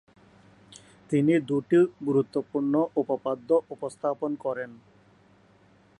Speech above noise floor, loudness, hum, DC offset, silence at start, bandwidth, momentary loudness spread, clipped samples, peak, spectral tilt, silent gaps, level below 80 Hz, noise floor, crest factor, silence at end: 33 dB; -26 LUFS; none; under 0.1%; 1.1 s; 11 kHz; 9 LU; under 0.1%; -10 dBFS; -8 dB/octave; none; -72 dBFS; -59 dBFS; 16 dB; 1.25 s